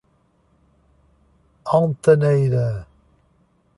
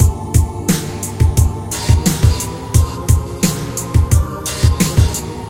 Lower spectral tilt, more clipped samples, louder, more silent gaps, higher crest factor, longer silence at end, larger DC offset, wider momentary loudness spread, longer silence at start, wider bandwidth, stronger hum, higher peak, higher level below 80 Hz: first, -8.5 dB/octave vs -5 dB/octave; neither; about the same, -18 LUFS vs -16 LUFS; neither; about the same, 18 dB vs 14 dB; first, 0.95 s vs 0 s; second, under 0.1% vs 0.4%; first, 14 LU vs 5 LU; first, 1.65 s vs 0 s; second, 11.5 kHz vs 16.5 kHz; neither; second, -4 dBFS vs 0 dBFS; second, -52 dBFS vs -20 dBFS